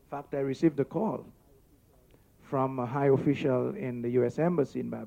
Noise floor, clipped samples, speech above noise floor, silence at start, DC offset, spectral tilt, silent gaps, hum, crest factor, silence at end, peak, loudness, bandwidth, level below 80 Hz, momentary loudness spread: -61 dBFS; under 0.1%; 32 dB; 0.1 s; under 0.1%; -9 dB/octave; none; none; 16 dB; 0 s; -14 dBFS; -29 LUFS; 15.5 kHz; -64 dBFS; 8 LU